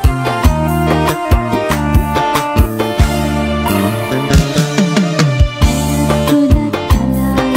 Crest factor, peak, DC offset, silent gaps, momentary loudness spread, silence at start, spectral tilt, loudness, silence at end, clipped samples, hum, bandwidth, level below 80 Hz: 12 dB; 0 dBFS; under 0.1%; none; 3 LU; 0 s; -6 dB/octave; -13 LUFS; 0 s; under 0.1%; none; 16.5 kHz; -18 dBFS